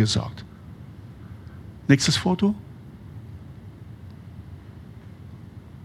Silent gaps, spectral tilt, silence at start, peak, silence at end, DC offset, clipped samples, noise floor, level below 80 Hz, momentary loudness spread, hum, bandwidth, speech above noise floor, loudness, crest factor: none; -5 dB/octave; 0 s; -2 dBFS; 0 s; under 0.1%; under 0.1%; -42 dBFS; -52 dBFS; 22 LU; none; 13.5 kHz; 21 dB; -23 LUFS; 24 dB